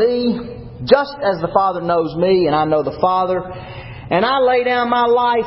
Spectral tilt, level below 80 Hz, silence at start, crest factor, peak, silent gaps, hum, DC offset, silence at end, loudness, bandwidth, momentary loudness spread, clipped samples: -10 dB/octave; -44 dBFS; 0 s; 16 dB; 0 dBFS; none; none; under 0.1%; 0 s; -16 LUFS; 5.8 kHz; 14 LU; under 0.1%